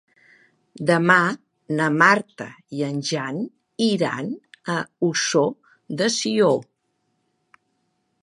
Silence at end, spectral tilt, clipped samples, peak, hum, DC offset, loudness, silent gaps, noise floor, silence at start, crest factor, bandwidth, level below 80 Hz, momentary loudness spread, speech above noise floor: 1.6 s; -4 dB/octave; under 0.1%; -2 dBFS; none; under 0.1%; -21 LUFS; none; -72 dBFS; 0.75 s; 22 dB; 11.5 kHz; -72 dBFS; 17 LU; 51 dB